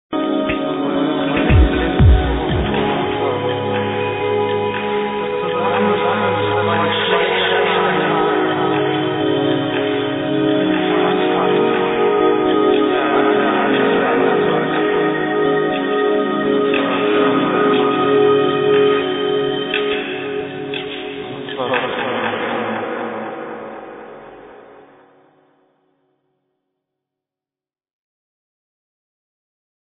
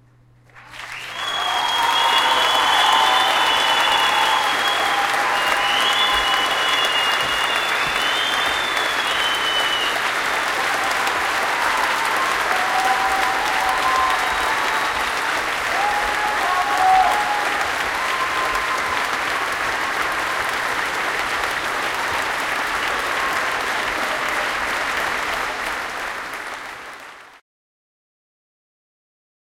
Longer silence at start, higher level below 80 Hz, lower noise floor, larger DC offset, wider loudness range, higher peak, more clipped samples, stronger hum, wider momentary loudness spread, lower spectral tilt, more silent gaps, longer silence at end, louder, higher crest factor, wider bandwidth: second, 0.1 s vs 0.55 s; first, -30 dBFS vs -50 dBFS; first, under -90 dBFS vs -52 dBFS; neither; about the same, 8 LU vs 7 LU; about the same, -2 dBFS vs -2 dBFS; neither; neither; first, 10 LU vs 6 LU; first, -10 dB/octave vs -0.5 dB/octave; neither; first, 5.2 s vs 2.2 s; about the same, -17 LUFS vs -19 LUFS; about the same, 16 dB vs 18 dB; second, 4 kHz vs 17 kHz